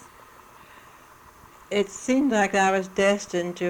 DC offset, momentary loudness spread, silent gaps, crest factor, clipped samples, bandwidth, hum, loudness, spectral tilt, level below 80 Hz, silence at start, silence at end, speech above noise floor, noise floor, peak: under 0.1%; 7 LU; none; 16 dB; under 0.1%; over 20 kHz; none; -23 LUFS; -4.5 dB/octave; -60 dBFS; 1.7 s; 0 s; 27 dB; -50 dBFS; -10 dBFS